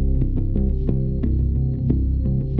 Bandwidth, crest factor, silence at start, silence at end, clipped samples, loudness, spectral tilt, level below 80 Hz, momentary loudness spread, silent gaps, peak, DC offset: 2.1 kHz; 12 dB; 0 s; 0 s; under 0.1%; -22 LUFS; -13 dB/octave; -22 dBFS; 2 LU; none; -6 dBFS; under 0.1%